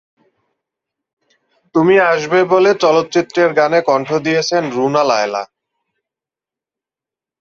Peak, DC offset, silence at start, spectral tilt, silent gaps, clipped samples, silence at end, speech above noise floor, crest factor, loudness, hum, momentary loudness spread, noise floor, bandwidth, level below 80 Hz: -2 dBFS; under 0.1%; 1.75 s; -5 dB/octave; none; under 0.1%; 1.95 s; 75 dB; 14 dB; -14 LUFS; none; 6 LU; -88 dBFS; 7.6 kHz; -62 dBFS